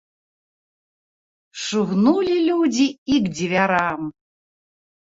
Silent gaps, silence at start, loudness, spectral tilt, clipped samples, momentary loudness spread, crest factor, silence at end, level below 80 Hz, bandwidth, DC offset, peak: 2.98-3.06 s; 1.55 s; -20 LUFS; -5 dB/octave; under 0.1%; 12 LU; 18 dB; 0.9 s; -58 dBFS; 7.8 kHz; under 0.1%; -4 dBFS